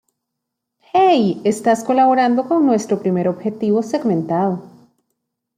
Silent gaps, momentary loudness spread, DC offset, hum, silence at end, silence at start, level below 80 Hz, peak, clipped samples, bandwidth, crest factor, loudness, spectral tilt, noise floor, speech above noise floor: none; 7 LU; under 0.1%; none; 0.9 s; 0.95 s; -66 dBFS; -2 dBFS; under 0.1%; 14.5 kHz; 14 dB; -17 LUFS; -6.5 dB/octave; -79 dBFS; 62 dB